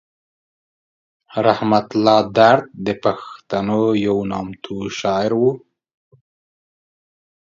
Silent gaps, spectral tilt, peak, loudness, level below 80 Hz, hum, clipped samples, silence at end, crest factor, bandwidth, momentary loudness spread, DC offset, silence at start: none; -6 dB/octave; 0 dBFS; -18 LUFS; -56 dBFS; none; under 0.1%; 2 s; 20 dB; 7.6 kHz; 14 LU; under 0.1%; 1.3 s